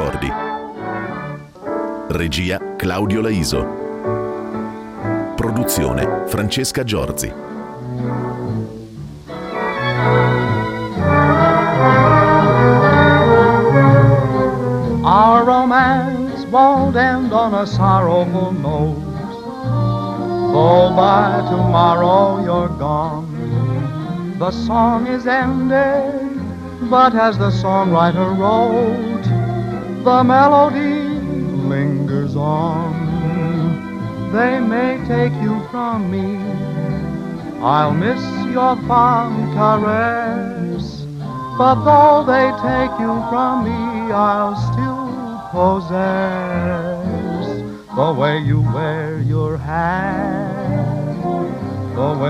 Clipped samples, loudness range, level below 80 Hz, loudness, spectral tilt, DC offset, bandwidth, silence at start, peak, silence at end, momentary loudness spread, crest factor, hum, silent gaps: under 0.1%; 8 LU; -40 dBFS; -16 LUFS; -7 dB/octave; under 0.1%; 15.5 kHz; 0 s; 0 dBFS; 0 s; 13 LU; 16 dB; none; none